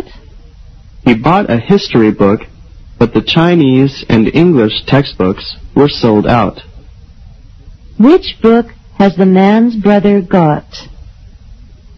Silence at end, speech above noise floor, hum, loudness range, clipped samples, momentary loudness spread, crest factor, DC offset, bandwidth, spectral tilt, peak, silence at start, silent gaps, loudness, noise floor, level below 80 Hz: 0.45 s; 26 dB; none; 3 LU; 0.5%; 8 LU; 10 dB; under 0.1%; 6.4 kHz; -8 dB/octave; 0 dBFS; 0 s; none; -10 LUFS; -35 dBFS; -34 dBFS